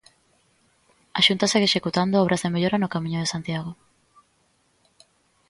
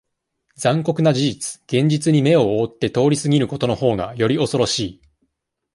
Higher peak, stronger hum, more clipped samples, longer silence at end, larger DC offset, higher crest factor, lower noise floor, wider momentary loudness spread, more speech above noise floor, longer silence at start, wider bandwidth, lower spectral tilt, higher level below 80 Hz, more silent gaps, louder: about the same, -4 dBFS vs -2 dBFS; neither; neither; first, 1.75 s vs 0.8 s; neither; first, 22 dB vs 16 dB; second, -66 dBFS vs -75 dBFS; first, 12 LU vs 6 LU; second, 43 dB vs 57 dB; first, 1.15 s vs 0.6 s; about the same, 11.5 kHz vs 11.5 kHz; about the same, -4.5 dB/octave vs -5.5 dB/octave; second, -60 dBFS vs -52 dBFS; neither; second, -22 LUFS vs -19 LUFS